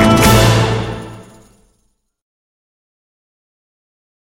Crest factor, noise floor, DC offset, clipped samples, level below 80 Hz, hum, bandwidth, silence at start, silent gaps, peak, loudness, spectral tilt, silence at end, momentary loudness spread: 16 dB; -63 dBFS; under 0.1%; under 0.1%; -30 dBFS; none; 17.5 kHz; 0 s; none; 0 dBFS; -11 LUFS; -5 dB/octave; 3.05 s; 20 LU